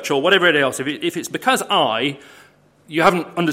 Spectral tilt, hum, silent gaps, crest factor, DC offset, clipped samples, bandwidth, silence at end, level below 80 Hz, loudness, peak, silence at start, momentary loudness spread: -3.5 dB/octave; none; none; 18 dB; under 0.1%; under 0.1%; 16.5 kHz; 0 s; -60 dBFS; -18 LUFS; 0 dBFS; 0 s; 10 LU